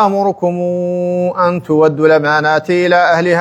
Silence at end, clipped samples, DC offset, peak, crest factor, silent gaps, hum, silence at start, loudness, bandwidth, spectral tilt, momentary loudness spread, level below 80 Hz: 0 s; under 0.1%; under 0.1%; 0 dBFS; 12 dB; none; none; 0 s; -13 LUFS; 9.8 kHz; -6.5 dB/octave; 6 LU; -60 dBFS